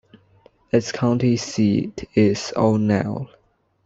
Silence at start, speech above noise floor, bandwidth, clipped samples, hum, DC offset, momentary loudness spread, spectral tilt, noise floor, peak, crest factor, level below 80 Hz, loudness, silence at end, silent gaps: 0.75 s; 36 dB; 8 kHz; under 0.1%; none; under 0.1%; 6 LU; -6.5 dB/octave; -55 dBFS; -4 dBFS; 18 dB; -54 dBFS; -20 LUFS; 0.6 s; none